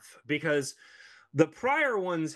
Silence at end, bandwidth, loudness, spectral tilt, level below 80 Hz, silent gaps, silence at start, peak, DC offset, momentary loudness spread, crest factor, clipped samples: 0 s; 12.5 kHz; -28 LUFS; -5 dB/octave; -74 dBFS; none; 0.05 s; -8 dBFS; under 0.1%; 9 LU; 22 dB; under 0.1%